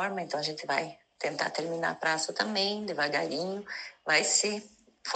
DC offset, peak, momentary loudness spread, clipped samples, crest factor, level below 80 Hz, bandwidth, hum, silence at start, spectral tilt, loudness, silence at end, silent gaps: under 0.1%; -10 dBFS; 12 LU; under 0.1%; 20 dB; -78 dBFS; 9.4 kHz; none; 0 s; -1.5 dB/octave; -30 LUFS; 0 s; none